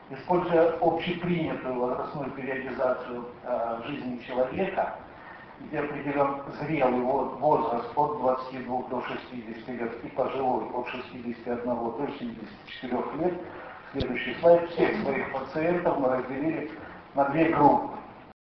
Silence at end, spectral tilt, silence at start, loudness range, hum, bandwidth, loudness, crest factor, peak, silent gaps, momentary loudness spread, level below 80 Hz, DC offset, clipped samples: 0.1 s; -9 dB/octave; 0 s; 6 LU; none; 6 kHz; -28 LUFS; 22 dB; -6 dBFS; none; 15 LU; -56 dBFS; under 0.1%; under 0.1%